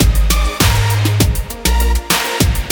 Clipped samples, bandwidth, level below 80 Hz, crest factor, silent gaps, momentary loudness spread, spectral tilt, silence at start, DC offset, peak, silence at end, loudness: under 0.1%; 19.5 kHz; -16 dBFS; 12 dB; none; 3 LU; -4 dB/octave; 0 s; under 0.1%; 0 dBFS; 0 s; -14 LUFS